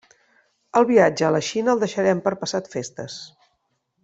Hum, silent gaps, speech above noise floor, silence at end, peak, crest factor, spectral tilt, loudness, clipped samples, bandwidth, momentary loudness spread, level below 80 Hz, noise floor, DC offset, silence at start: none; none; 51 dB; 0.75 s; -4 dBFS; 20 dB; -5 dB/octave; -21 LUFS; under 0.1%; 8.2 kHz; 16 LU; -64 dBFS; -72 dBFS; under 0.1%; 0.75 s